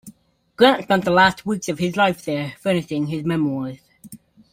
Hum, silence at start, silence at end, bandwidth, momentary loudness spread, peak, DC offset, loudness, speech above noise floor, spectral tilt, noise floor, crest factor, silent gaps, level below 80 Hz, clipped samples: none; 0.05 s; 0.35 s; 16.5 kHz; 10 LU; -2 dBFS; under 0.1%; -20 LUFS; 30 dB; -5.5 dB/octave; -49 dBFS; 20 dB; none; -56 dBFS; under 0.1%